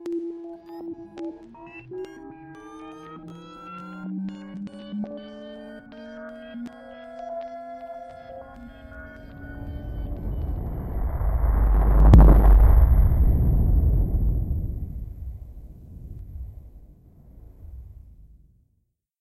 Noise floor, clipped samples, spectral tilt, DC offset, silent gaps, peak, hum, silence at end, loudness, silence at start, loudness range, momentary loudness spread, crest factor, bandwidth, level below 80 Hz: -72 dBFS; under 0.1%; -9.5 dB/octave; under 0.1%; none; -2 dBFS; none; 1.35 s; -22 LUFS; 0 s; 20 LU; 24 LU; 22 dB; 12.5 kHz; -24 dBFS